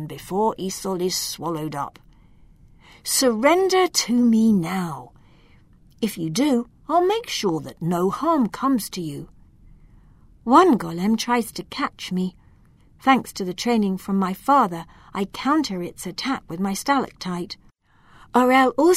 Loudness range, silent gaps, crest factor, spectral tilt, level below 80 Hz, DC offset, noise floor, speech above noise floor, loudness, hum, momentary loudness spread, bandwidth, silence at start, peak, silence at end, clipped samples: 4 LU; none; 22 dB; -4.5 dB/octave; -54 dBFS; under 0.1%; -54 dBFS; 33 dB; -22 LUFS; none; 13 LU; 16 kHz; 0 s; -2 dBFS; 0 s; under 0.1%